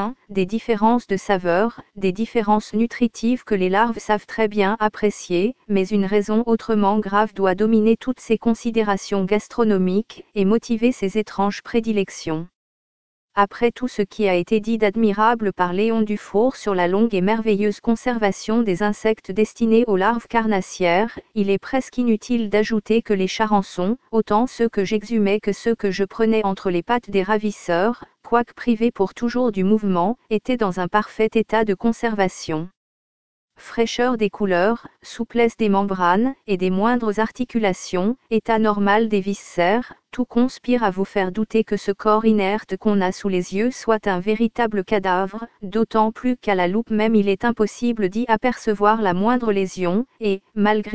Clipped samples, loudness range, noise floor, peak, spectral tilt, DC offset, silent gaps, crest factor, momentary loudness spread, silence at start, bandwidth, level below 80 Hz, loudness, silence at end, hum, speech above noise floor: under 0.1%; 2 LU; under -90 dBFS; -2 dBFS; -6 dB/octave; 1%; 12.55-13.28 s, 32.77-33.48 s; 18 dB; 5 LU; 0 s; 8 kHz; -50 dBFS; -20 LUFS; 0 s; none; over 70 dB